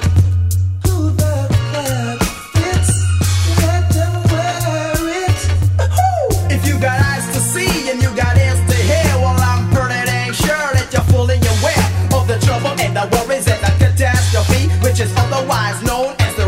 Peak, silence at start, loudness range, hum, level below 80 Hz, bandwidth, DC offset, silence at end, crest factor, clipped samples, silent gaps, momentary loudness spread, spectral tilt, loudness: 0 dBFS; 0 s; 1 LU; none; -28 dBFS; 16.5 kHz; 0.2%; 0 s; 14 dB; under 0.1%; none; 4 LU; -5 dB/octave; -15 LUFS